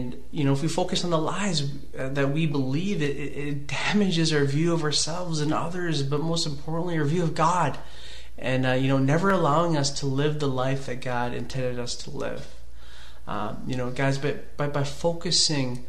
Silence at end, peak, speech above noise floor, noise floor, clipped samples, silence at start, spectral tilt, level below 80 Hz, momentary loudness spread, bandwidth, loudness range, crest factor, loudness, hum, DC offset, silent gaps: 0 s; -10 dBFS; 20 dB; -46 dBFS; under 0.1%; 0 s; -5 dB/octave; -48 dBFS; 11 LU; 12.5 kHz; 7 LU; 18 dB; -26 LUFS; none; 3%; none